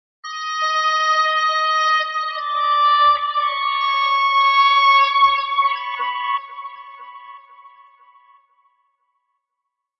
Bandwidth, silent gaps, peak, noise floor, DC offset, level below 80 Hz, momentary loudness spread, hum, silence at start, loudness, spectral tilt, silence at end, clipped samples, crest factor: 6 kHz; none; -4 dBFS; -80 dBFS; under 0.1%; -66 dBFS; 18 LU; none; 0.25 s; -17 LUFS; 2.5 dB/octave; 2.3 s; under 0.1%; 16 dB